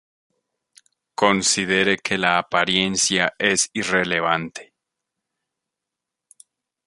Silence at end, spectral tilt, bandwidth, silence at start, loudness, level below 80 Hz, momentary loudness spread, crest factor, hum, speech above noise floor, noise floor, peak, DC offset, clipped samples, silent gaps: 2.25 s; -2.5 dB/octave; 11.5 kHz; 1.2 s; -19 LUFS; -58 dBFS; 5 LU; 22 dB; none; 64 dB; -85 dBFS; -2 dBFS; under 0.1%; under 0.1%; none